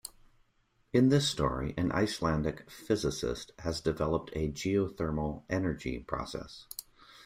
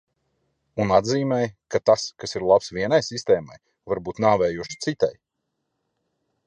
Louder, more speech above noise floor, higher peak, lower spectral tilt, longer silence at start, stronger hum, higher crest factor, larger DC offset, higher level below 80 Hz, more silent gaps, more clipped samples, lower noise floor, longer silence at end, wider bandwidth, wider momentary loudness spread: second, -32 LUFS vs -23 LUFS; second, 40 dB vs 56 dB; second, -14 dBFS vs -4 dBFS; about the same, -5.5 dB/octave vs -5 dB/octave; second, 0.05 s vs 0.75 s; neither; about the same, 20 dB vs 20 dB; neither; first, -50 dBFS vs -56 dBFS; neither; neither; second, -71 dBFS vs -78 dBFS; second, 0.05 s vs 1.35 s; first, 16 kHz vs 10 kHz; first, 15 LU vs 9 LU